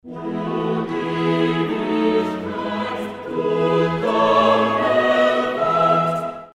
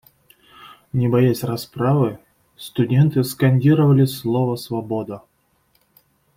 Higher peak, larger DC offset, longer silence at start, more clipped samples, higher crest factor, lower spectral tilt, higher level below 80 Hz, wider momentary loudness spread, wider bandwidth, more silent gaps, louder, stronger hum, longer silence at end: about the same, -4 dBFS vs -4 dBFS; neither; second, 0.05 s vs 0.65 s; neither; about the same, 14 dB vs 16 dB; about the same, -6.5 dB/octave vs -7.5 dB/octave; about the same, -56 dBFS vs -56 dBFS; about the same, 10 LU vs 12 LU; second, 12.5 kHz vs 16 kHz; neither; about the same, -19 LUFS vs -19 LUFS; neither; second, 0.05 s vs 1.2 s